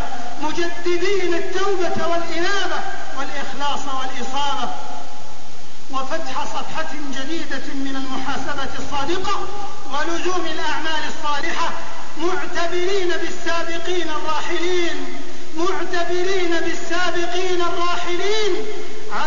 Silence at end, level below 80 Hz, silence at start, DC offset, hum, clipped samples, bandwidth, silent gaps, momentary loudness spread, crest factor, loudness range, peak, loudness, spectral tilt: 0 s; -50 dBFS; 0 s; 30%; none; under 0.1%; 7.4 kHz; none; 9 LU; 14 dB; 5 LU; -6 dBFS; -24 LUFS; -3.5 dB/octave